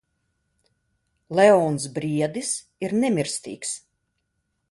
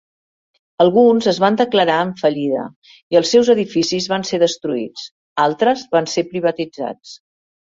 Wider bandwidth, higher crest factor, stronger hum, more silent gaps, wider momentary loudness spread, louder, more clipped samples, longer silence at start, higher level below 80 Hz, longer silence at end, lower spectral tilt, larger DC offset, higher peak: first, 11.5 kHz vs 7.8 kHz; first, 22 dB vs 16 dB; neither; second, none vs 2.76-2.82 s, 3.03-3.11 s, 5.11-5.36 s; about the same, 14 LU vs 13 LU; second, -23 LUFS vs -16 LUFS; neither; first, 1.3 s vs 0.8 s; about the same, -66 dBFS vs -62 dBFS; first, 0.9 s vs 0.5 s; about the same, -4.5 dB/octave vs -4.5 dB/octave; neither; about the same, -2 dBFS vs -2 dBFS